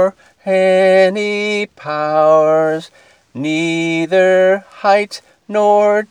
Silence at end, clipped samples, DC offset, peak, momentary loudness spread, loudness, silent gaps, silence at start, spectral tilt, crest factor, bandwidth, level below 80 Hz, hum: 0.05 s; under 0.1%; under 0.1%; 0 dBFS; 12 LU; -14 LUFS; none; 0 s; -5 dB/octave; 14 dB; 11 kHz; -70 dBFS; none